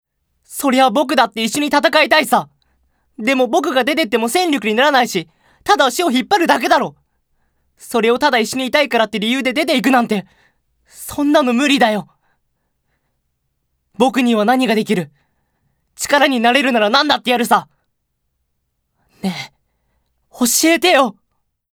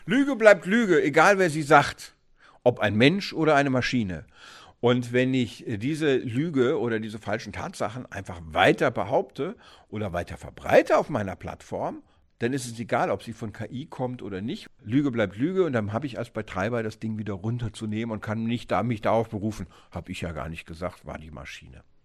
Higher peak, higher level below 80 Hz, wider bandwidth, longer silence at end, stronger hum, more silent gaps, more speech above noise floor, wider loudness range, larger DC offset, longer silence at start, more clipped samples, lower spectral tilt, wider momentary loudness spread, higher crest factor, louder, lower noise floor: about the same, 0 dBFS vs 0 dBFS; about the same, -58 dBFS vs -54 dBFS; first, over 20 kHz vs 13 kHz; first, 0.6 s vs 0.25 s; neither; neither; first, 55 dB vs 32 dB; second, 4 LU vs 8 LU; neither; first, 0.5 s vs 0 s; neither; second, -3 dB/octave vs -6 dB/octave; second, 11 LU vs 17 LU; second, 16 dB vs 26 dB; first, -15 LUFS vs -25 LUFS; first, -70 dBFS vs -57 dBFS